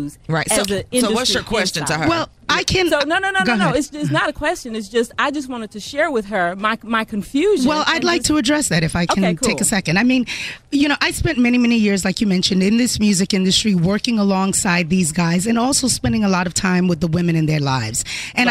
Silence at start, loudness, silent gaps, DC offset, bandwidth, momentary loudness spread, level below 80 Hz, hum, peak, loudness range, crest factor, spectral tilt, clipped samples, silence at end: 0 s; -17 LUFS; none; under 0.1%; 16 kHz; 6 LU; -40 dBFS; none; 0 dBFS; 3 LU; 16 dB; -4 dB/octave; under 0.1%; 0 s